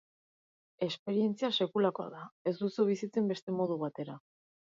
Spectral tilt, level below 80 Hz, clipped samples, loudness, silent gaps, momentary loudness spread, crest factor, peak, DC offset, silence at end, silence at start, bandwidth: -6.5 dB/octave; -84 dBFS; under 0.1%; -33 LUFS; 0.99-1.06 s, 2.32-2.45 s, 3.42-3.47 s; 12 LU; 18 dB; -18 dBFS; under 0.1%; 0.5 s; 0.8 s; 7.6 kHz